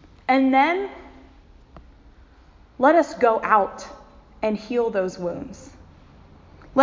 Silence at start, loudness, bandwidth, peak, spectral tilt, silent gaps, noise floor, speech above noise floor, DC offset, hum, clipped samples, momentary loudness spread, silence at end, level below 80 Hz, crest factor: 0.3 s; -21 LUFS; 7.6 kHz; -2 dBFS; -5.5 dB/octave; none; -51 dBFS; 30 dB; under 0.1%; none; under 0.1%; 21 LU; 0 s; -52 dBFS; 20 dB